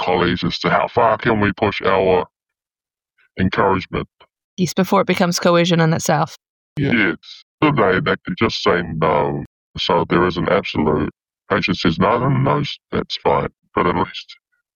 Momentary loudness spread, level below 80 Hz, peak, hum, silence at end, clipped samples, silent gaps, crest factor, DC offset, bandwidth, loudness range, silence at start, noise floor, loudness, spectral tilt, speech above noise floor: 10 LU; -44 dBFS; -2 dBFS; none; 0.45 s; under 0.1%; 4.44-4.57 s, 6.49-6.76 s, 7.42-7.58 s, 9.46-9.74 s; 16 dB; under 0.1%; 17 kHz; 2 LU; 0 s; under -90 dBFS; -18 LUFS; -5.5 dB/octave; over 73 dB